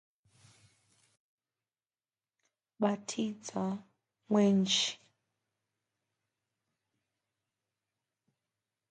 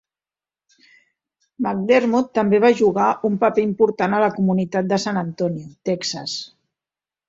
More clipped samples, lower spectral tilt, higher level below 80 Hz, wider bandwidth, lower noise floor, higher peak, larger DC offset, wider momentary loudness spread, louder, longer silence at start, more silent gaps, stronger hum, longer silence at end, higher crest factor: neither; second, -4.5 dB/octave vs -6 dB/octave; second, -84 dBFS vs -62 dBFS; first, 9.4 kHz vs 7.8 kHz; about the same, under -90 dBFS vs under -90 dBFS; second, -16 dBFS vs -2 dBFS; neither; about the same, 11 LU vs 11 LU; second, -32 LUFS vs -19 LUFS; first, 2.8 s vs 1.6 s; neither; neither; first, 3.95 s vs 0.8 s; about the same, 22 dB vs 18 dB